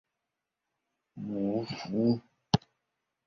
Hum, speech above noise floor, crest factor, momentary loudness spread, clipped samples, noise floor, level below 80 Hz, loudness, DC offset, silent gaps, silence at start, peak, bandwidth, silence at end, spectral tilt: none; 56 dB; 26 dB; 7 LU; under 0.1%; -87 dBFS; -60 dBFS; -32 LUFS; under 0.1%; none; 1.15 s; -8 dBFS; 7.2 kHz; 0.7 s; -6.5 dB/octave